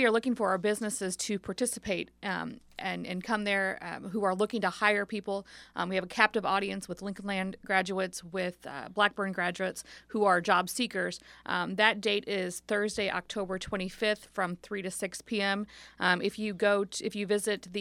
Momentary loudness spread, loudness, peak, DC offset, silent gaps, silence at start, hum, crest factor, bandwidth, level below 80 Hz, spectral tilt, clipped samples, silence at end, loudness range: 10 LU; -31 LUFS; -6 dBFS; under 0.1%; none; 0 s; none; 24 dB; 16 kHz; -64 dBFS; -3.5 dB/octave; under 0.1%; 0 s; 4 LU